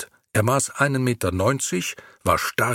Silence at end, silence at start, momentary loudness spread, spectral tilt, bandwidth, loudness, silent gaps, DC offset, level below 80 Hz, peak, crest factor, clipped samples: 0 s; 0 s; 6 LU; -4.5 dB/octave; 17.5 kHz; -22 LUFS; none; under 0.1%; -50 dBFS; -2 dBFS; 20 dB; under 0.1%